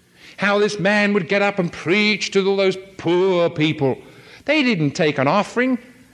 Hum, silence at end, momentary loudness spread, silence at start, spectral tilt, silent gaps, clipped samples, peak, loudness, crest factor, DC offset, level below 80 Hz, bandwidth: none; 0.35 s; 6 LU; 0.25 s; -5.5 dB/octave; none; under 0.1%; -4 dBFS; -19 LUFS; 16 dB; under 0.1%; -62 dBFS; 11 kHz